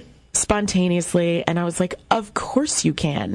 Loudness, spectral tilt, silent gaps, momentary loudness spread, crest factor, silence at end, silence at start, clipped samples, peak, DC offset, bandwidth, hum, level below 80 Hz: -21 LUFS; -4.5 dB/octave; none; 4 LU; 20 dB; 0 s; 0 s; under 0.1%; -2 dBFS; under 0.1%; 12 kHz; none; -44 dBFS